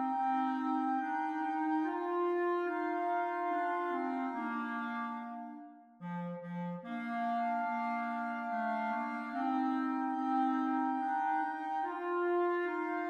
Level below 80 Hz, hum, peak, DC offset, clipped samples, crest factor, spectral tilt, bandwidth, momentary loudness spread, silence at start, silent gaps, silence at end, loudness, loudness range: -88 dBFS; none; -22 dBFS; under 0.1%; under 0.1%; 12 dB; -7.5 dB/octave; 8.2 kHz; 8 LU; 0 s; none; 0 s; -35 LUFS; 5 LU